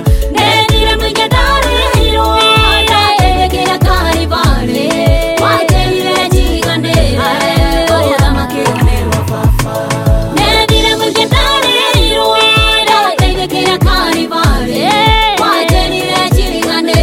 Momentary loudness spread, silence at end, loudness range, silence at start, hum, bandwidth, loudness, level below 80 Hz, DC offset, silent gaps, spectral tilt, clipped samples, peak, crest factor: 5 LU; 0 s; 3 LU; 0 s; none; 17 kHz; -10 LUFS; -16 dBFS; under 0.1%; none; -4.5 dB/octave; under 0.1%; 0 dBFS; 10 dB